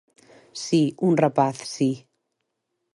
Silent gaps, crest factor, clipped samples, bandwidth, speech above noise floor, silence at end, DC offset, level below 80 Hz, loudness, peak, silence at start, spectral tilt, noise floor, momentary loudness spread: none; 18 dB; under 0.1%; 11.5 kHz; 57 dB; 0.95 s; under 0.1%; -72 dBFS; -22 LUFS; -6 dBFS; 0.55 s; -6 dB/octave; -78 dBFS; 15 LU